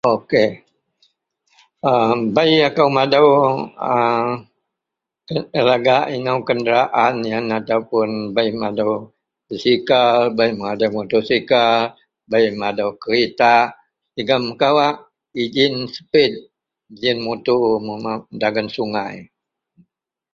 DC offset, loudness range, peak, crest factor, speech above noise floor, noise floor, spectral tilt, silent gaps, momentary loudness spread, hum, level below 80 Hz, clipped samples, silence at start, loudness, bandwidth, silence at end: under 0.1%; 3 LU; 0 dBFS; 18 dB; 67 dB; -84 dBFS; -6 dB/octave; none; 11 LU; none; -60 dBFS; under 0.1%; 0.05 s; -17 LUFS; 7.2 kHz; 1.1 s